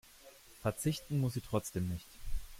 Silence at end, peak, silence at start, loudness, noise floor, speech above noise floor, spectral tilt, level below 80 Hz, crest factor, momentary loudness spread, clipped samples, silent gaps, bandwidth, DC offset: 0 s; -18 dBFS; 0.25 s; -38 LUFS; -58 dBFS; 22 dB; -6 dB/octave; -48 dBFS; 20 dB; 20 LU; under 0.1%; none; 16.5 kHz; under 0.1%